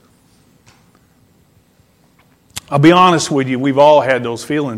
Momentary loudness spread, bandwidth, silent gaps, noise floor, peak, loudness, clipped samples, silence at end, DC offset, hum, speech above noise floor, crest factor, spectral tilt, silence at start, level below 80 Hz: 11 LU; 14 kHz; none; -53 dBFS; 0 dBFS; -12 LUFS; under 0.1%; 0 s; under 0.1%; none; 41 dB; 16 dB; -5.5 dB/octave; 2.55 s; -56 dBFS